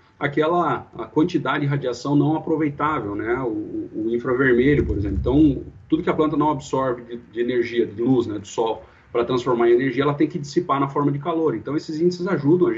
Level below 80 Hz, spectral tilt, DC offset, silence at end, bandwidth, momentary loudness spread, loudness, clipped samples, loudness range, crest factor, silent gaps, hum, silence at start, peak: -40 dBFS; -7.5 dB/octave; under 0.1%; 0 s; 7.8 kHz; 9 LU; -21 LUFS; under 0.1%; 2 LU; 14 dB; none; none; 0.2 s; -6 dBFS